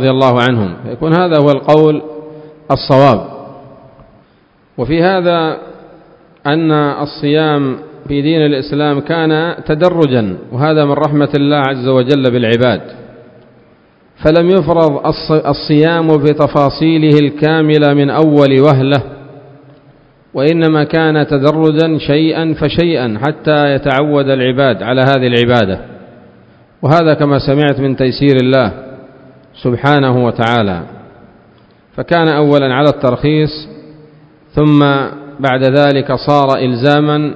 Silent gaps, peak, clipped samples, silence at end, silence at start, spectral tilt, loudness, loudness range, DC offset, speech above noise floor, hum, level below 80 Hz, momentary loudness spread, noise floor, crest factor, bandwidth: none; 0 dBFS; 0.4%; 0 s; 0 s; -8.5 dB/octave; -11 LUFS; 4 LU; under 0.1%; 39 dB; none; -42 dBFS; 9 LU; -49 dBFS; 12 dB; 8 kHz